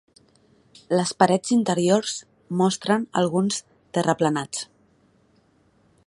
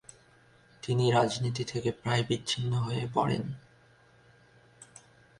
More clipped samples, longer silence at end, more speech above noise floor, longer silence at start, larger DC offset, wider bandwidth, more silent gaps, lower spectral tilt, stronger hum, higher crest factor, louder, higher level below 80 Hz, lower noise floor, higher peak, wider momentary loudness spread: neither; first, 1.45 s vs 0.55 s; first, 40 dB vs 32 dB; about the same, 0.9 s vs 0.85 s; neither; about the same, 11.5 kHz vs 11 kHz; neither; about the same, -5 dB/octave vs -5.5 dB/octave; neither; about the same, 22 dB vs 22 dB; first, -23 LUFS vs -30 LUFS; about the same, -66 dBFS vs -62 dBFS; about the same, -61 dBFS vs -61 dBFS; first, -2 dBFS vs -10 dBFS; second, 11 LU vs 19 LU